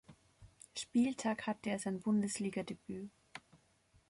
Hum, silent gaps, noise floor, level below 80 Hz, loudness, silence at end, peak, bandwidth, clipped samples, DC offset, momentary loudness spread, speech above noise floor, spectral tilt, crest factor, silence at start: none; none; -71 dBFS; -72 dBFS; -38 LUFS; 0.7 s; -24 dBFS; 11.5 kHz; under 0.1%; under 0.1%; 20 LU; 34 dB; -5 dB/octave; 16 dB; 0.1 s